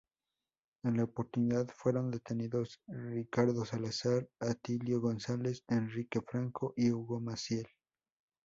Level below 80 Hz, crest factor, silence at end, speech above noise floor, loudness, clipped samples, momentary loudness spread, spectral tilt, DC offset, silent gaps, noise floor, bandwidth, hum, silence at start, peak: -70 dBFS; 18 dB; 0.8 s; over 55 dB; -36 LUFS; under 0.1%; 6 LU; -6.5 dB/octave; under 0.1%; none; under -90 dBFS; 7.8 kHz; none; 0.85 s; -18 dBFS